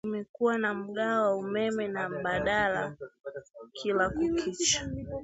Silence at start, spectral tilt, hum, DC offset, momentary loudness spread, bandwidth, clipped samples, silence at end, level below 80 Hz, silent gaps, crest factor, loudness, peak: 0.05 s; -3 dB/octave; none; under 0.1%; 16 LU; 8.2 kHz; under 0.1%; 0 s; -54 dBFS; 0.29-0.34 s, 3.20-3.24 s; 18 dB; -29 LUFS; -12 dBFS